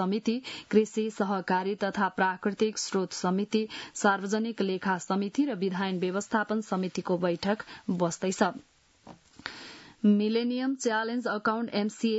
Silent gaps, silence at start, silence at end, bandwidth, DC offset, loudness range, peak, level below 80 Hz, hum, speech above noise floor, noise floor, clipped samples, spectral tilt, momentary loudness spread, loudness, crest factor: none; 0 s; 0 s; 8 kHz; under 0.1%; 2 LU; -10 dBFS; -72 dBFS; none; 25 dB; -54 dBFS; under 0.1%; -5 dB/octave; 6 LU; -29 LUFS; 20 dB